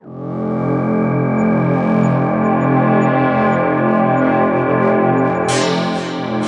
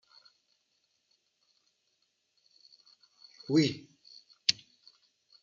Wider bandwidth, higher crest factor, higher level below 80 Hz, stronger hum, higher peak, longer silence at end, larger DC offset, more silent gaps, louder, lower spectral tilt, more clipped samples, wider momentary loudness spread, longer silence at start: first, 11 kHz vs 7.4 kHz; second, 12 dB vs 30 dB; first, -54 dBFS vs -78 dBFS; neither; first, -2 dBFS vs -8 dBFS; second, 0 s vs 0.9 s; neither; neither; first, -15 LUFS vs -30 LUFS; first, -7 dB/octave vs -4 dB/octave; neither; second, 6 LU vs 26 LU; second, 0.05 s vs 3.5 s